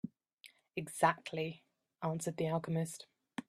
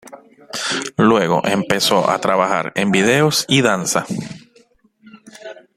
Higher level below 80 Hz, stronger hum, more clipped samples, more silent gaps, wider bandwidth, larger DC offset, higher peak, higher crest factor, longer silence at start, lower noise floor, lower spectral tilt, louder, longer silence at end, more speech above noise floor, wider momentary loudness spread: second, -78 dBFS vs -56 dBFS; neither; neither; first, 0.33-0.38 s vs none; second, 14 kHz vs 15.5 kHz; neither; second, -14 dBFS vs 0 dBFS; first, 24 dB vs 18 dB; about the same, 0.05 s vs 0.05 s; first, -63 dBFS vs -54 dBFS; first, -5.5 dB/octave vs -4 dB/octave; second, -37 LUFS vs -16 LUFS; second, 0.1 s vs 0.25 s; second, 27 dB vs 38 dB; about the same, 16 LU vs 15 LU